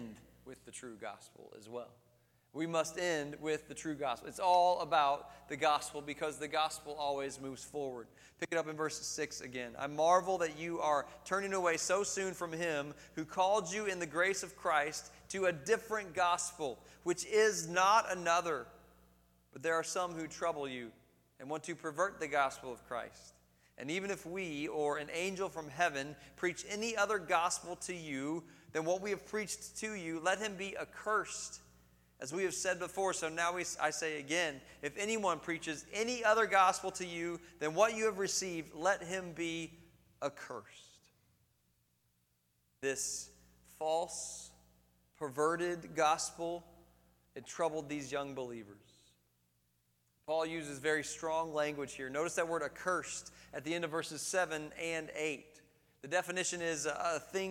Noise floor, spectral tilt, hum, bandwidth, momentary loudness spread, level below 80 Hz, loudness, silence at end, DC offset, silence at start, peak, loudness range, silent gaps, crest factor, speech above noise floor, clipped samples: -77 dBFS; -3 dB/octave; 60 Hz at -70 dBFS; 17 kHz; 14 LU; -70 dBFS; -36 LUFS; 0 s; under 0.1%; 0 s; -14 dBFS; 8 LU; none; 22 dB; 41 dB; under 0.1%